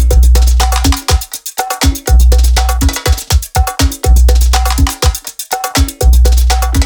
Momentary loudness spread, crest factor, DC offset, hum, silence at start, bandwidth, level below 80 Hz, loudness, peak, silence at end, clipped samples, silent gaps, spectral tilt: 6 LU; 8 dB; under 0.1%; none; 0 s; over 20 kHz; -10 dBFS; -11 LUFS; 0 dBFS; 0 s; under 0.1%; none; -4 dB/octave